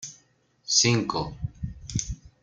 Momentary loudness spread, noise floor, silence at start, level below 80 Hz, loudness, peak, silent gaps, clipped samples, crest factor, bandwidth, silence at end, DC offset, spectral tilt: 19 LU; -64 dBFS; 0 s; -46 dBFS; -25 LUFS; -8 dBFS; none; under 0.1%; 20 dB; 10 kHz; 0.15 s; under 0.1%; -3 dB/octave